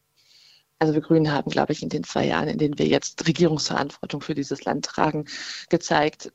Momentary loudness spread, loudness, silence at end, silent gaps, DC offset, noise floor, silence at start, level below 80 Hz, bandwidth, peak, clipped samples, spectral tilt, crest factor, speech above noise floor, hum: 8 LU; -24 LUFS; 0.05 s; none; under 0.1%; -57 dBFS; 0.8 s; -56 dBFS; 8.2 kHz; -2 dBFS; under 0.1%; -5 dB/octave; 22 dB; 33 dB; none